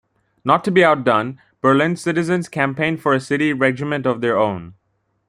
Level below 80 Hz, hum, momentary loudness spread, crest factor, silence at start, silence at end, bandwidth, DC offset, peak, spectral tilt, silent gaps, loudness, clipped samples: -60 dBFS; none; 7 LU; 18 dB; 0.45 s; 0.55 s; 13.5 kHz; under 0.1%; 0 dBFS; -6.5 dB/octave; none; -18 LUFS; under 0.1%